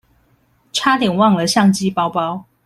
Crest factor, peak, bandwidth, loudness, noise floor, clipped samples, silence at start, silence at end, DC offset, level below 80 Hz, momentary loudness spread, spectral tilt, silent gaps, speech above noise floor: 16 dB; 0 dBFS; 14.5 kHz; -16 LUFS; -58 dBFS; under 0.1%; 0.75 s; 0.25 s; under 0.1%; -56 dBFS; 9 LU; -4.5 dB/octave; none; 43 dB